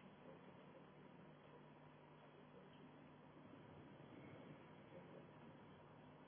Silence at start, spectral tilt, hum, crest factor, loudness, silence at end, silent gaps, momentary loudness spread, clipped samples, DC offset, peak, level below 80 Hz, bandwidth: 0 s; -4.5 dB/octave; none; 16 dB; -63 LUFS; 0 s; none; 4 LU; under 0.1%; under 0.1%; -48 dBFS; -88 dBFS; 3.5 kHz